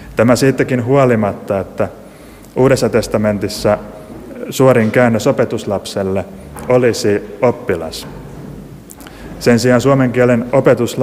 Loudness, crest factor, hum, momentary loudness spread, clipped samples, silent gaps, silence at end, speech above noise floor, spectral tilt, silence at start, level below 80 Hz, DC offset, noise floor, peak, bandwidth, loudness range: -14 LUFS; 14 dB; none; 20 LU; under 0.1%; none; 0 s; 24 dB; -6 dB/octave; 0 s; -42 dBFS; under 0.1%; -37 dBFS; 0 dBFS; 16 kHz; 3 LU